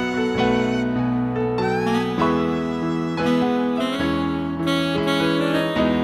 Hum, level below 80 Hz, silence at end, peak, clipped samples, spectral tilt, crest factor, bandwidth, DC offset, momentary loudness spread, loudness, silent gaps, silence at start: none; -46 dBFS; 0 s; -6 dBFS; under 0.1%; -6.5 dB/octave; 16 dB; 14 kHz; under 0.1%; 4 LU; -21 LUFS; none; 0 s